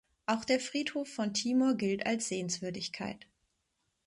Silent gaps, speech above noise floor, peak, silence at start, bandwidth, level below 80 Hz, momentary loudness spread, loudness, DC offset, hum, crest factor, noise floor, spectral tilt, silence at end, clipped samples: none; 48 dB; -16 dBFS; 0.3 s; 11.5 kHz; -72 dBFS; 9 LU; -33 LUFS; under 0.1%; none; 18 dB; -80 dBFS; -3.5 dB/octave; 0.9 s; under 0.1%